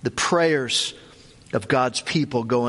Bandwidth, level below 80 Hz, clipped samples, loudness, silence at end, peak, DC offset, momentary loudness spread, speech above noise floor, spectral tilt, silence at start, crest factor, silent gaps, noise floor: 11.5 kHz; -56 dBFS; under 0.1%; -22 LUFS; 0 s; -6 dBFS; under 0.1%; 9 LU; 26 dB; -4 dB/octave; 0.05 s; 16 dB; none; -48 dBFS